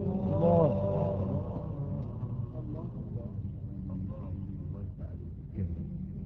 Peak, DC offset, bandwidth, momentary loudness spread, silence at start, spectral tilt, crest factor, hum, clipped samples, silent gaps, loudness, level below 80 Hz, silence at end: -12 dBFS; under 0.1%; 4 kHz; 14 LU; 0 s; -11.5 dB/octave; 20 dB; none; under 0.1%; none; -34 LUFS; -46 dBFS; 0 s